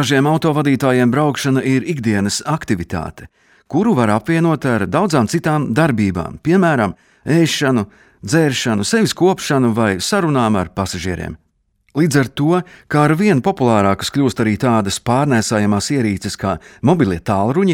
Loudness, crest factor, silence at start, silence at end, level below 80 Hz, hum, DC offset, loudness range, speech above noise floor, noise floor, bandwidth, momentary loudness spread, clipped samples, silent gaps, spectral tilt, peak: -16 LUFS; 14 dB; 0 s; 0 s; -46 dBFS; none; under 0.1%; 2 LU; 46 dB; -61 dBFS; 16.5 kHz; 8 LU; under 0.1%; none; -5.5 dB/octave; 0 dBFS